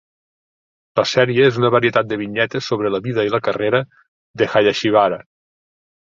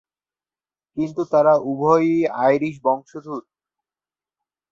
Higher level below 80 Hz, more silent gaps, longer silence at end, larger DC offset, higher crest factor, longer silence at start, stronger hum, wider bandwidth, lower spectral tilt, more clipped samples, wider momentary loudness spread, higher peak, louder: first, -58 dBFS vs -66 dBFS; first, 4.08-4.34 s vs none; second, 0.9 s vs 1.3 s; neither; about the same, 18 dB vs 18 dB; about the same, 0.95 s vs 0.95 s; neither; about the same, 7.6 kHz vs 7.4 kHz; second, -5.5 dB/octave vs -8 dB/octave; neither; second, 7 LU vs 16 LU; about the same, -2 dBFS vs -4 dBFS; about the same, -17 LUFS vs -19 LUFS